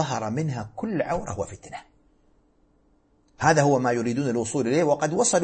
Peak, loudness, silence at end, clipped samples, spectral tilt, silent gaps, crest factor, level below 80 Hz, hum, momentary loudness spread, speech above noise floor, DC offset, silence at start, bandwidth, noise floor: -6 dBFS; -24 LUFS; 0 s; under 0.1%; -5 dB/octave; none; 20 dB; -56 dBFS; none; 14 LU; 39 dB; under 0.1%; 0 s; 8.8 kHz; -63 dBFS